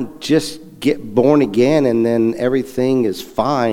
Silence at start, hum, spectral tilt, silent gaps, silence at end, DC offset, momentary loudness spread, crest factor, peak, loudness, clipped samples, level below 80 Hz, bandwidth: 0 s; none; -6.5 dB/octave; none; 0 s; under 0.1%; 7 LU; 14 dB; 0 dBFS; -16 LUFS; under 0.1%; -48 dBFS; 16.5 kHz